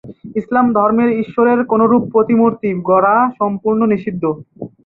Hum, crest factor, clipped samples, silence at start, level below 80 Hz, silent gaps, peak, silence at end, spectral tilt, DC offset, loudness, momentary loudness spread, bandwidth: none; 14 dB; under 0.1%; 0.05 s; -54 dBFS; none; -2 dBFS; 0.2 s; -11 dB/octave; under 0.1%; -14 LUFS; 9 LU; 4.1 kHz